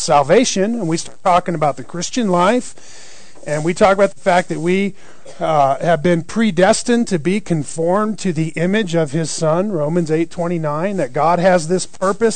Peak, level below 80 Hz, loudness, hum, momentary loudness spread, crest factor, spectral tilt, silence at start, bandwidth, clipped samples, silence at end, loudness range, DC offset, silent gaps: -2 dBFS; -50 dBFS; -17 LUFS; none; 7 LU; 14 dB; -5 dB/octave; 0 s; 9.4 kHz; under 0.1%; 0 s; 2 LU; 3%; none